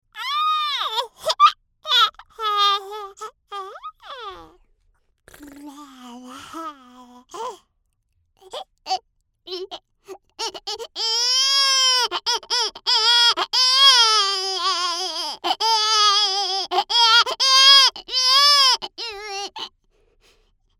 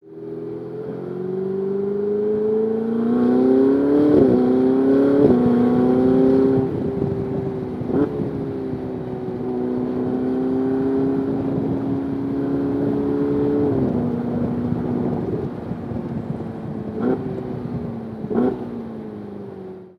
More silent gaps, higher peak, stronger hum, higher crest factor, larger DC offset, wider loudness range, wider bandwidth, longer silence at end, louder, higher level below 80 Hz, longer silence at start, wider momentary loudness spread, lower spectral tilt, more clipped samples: neither; about the same, -2 dBFS vs -2 dBFS; neither; about the same, 20 dB vs 18 dB; neither; first, 24 LU vs 10 LU; first, 17 kHz vs 5.2 kHz; first, 1.1 s vs 0.1 s; first, -16 LUFS vs -21 LUFS; second, -64 dBFS vs -48 dBFS; about the same, 0.15 s vs 0.05 s; first, 23 LU vs 14 LU; second, 2.5 dB/octave vs -10.5 dB/octave; neither